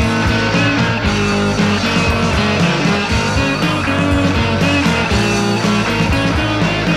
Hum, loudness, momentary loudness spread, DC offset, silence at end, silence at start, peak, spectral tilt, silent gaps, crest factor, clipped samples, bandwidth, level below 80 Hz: none; -14 LUFS; 2 LU; under 0.1%; 0 s; 0 s; -2 dBFS; -5 dB/octave; none; 12 dB; under 0.1%; 14.5 kHz; -28 dBFS